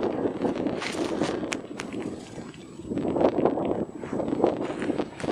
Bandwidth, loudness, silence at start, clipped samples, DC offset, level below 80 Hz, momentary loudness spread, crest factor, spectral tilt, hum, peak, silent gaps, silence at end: 12.5 kHz; -28 LUFS; 0 s; under 0.1%; under 0.1%; -56 dBFS; 12 LU; 24 dB; -6 dB/octave; none; -4 dBFS; none; 0 s